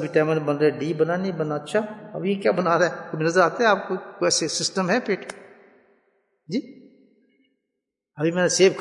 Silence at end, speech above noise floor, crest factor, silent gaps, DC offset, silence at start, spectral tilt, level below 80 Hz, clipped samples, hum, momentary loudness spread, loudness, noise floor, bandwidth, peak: 0 s; 60 dB; 20 dB; none; under 0.1%; 0 s; -4 dB/octave; -76 dBFS; under 0.1%; none; 11 LU; -23 LUFS; -82 dBFS; 11 kHz; -4 dBFS